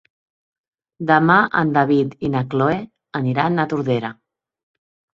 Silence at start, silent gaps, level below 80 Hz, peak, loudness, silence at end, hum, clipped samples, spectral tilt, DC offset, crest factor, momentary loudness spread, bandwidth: 1 s; none; -56 dBFS; -2 dBFS; -18 LUFS; 1 s; none; under 0.1%; -8.5 dB/octave; under 0.1%; 18 dB; 12 LU; 7.4 kHz